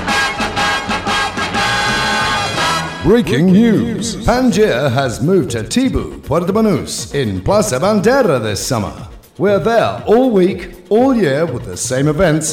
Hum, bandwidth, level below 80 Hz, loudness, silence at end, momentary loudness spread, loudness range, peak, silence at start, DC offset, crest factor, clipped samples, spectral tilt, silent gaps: none; 16.5 kHz; -34 dBFS; -14 LUFS; 0 s; 7 LU; 2 LU; -2 dBFS; 0 s; under 0.1%; 12 dB; under 0.1%; -5 dB/octave; none